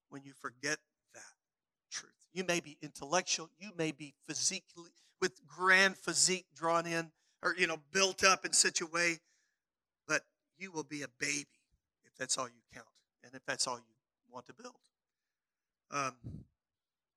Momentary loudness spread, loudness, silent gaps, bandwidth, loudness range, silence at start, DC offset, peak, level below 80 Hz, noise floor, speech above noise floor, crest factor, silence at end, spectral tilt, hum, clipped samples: 22 LU; -33 LUFS; none; 15.5 kHz; 11 LU; 0.1 s; under 0.1%; -10 dBFS; -76 dBFS; under -90 dBFS; over 54 dB; 28 dB; 0.75 s; -1.5 dB/octave; none; under 0.1%